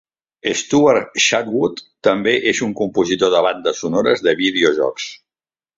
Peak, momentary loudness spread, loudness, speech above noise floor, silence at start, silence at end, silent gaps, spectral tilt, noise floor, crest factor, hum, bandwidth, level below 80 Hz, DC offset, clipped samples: -2 dBFS; 7 LU; -17 LUFS; over 73 dB; 0.45 s; 0.65 s; none; -3.5 dB/octave; under -90 dBFS; 16 dB; none; 7.8 kHz; -56 dBFS; under 0.1%; under 0.1%